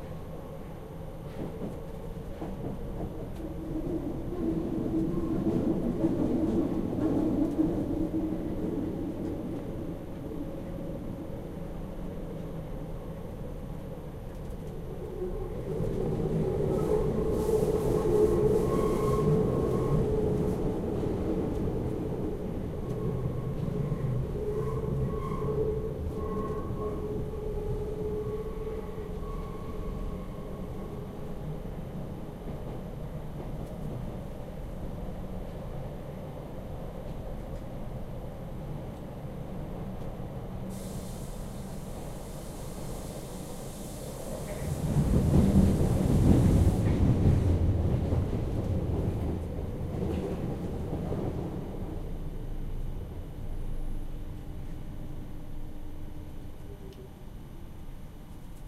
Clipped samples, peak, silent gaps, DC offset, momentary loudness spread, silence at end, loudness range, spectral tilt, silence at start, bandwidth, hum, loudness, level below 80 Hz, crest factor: under 0.1%; -10 dBFS; none; under 0.1%; 15 LU; 0 s; 13 LU; -8.5 dB/octave; 0 s; 16 kHz; none; -32 LUFS; -38 dBFS; 22 dB